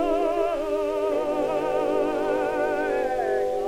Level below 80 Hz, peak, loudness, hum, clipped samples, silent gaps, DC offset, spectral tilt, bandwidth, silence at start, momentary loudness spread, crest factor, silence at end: -48 dBFS; -12 dBFS; -25 LUFS; none; under 0.1%; none; under 0.1%; -5 dB/octave; 16.5 kHz; 0 s; 2 LU; 12 dB; 0 s